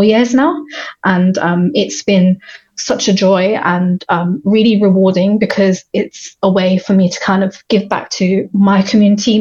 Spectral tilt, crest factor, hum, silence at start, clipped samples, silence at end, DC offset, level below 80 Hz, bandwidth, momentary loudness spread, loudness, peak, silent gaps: -6 dB/octave; 12 dB; none; 0 s; under 0.1%; 0 s; under 0.1%; -54 dBFS; 7.4 kHz; 8 LU; -13 LUFS; 0 dBFS; none